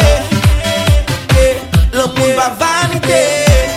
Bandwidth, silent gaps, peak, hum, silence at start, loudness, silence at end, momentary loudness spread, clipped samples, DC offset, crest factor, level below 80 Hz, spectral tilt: 16.5 kHz; none; 0 dBFS; none; 0 s; -12 LUFS; 0 s; 3 LU; under 0.1%; under 0.1%; 10 dB; -16 dBFS; -4.5 dB/octave